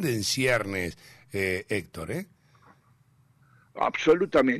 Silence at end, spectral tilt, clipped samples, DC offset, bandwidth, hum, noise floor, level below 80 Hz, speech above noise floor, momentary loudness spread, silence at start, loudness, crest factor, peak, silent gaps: 0 s; -4.5 dB/octave; under 0.1%; under 0.1%; 15 kHz; none; -62 dBFS; -58 dBFS; 36 dB; 14 LU; 0 s; -27 LUFS; 16 dB; -12 dBFS; none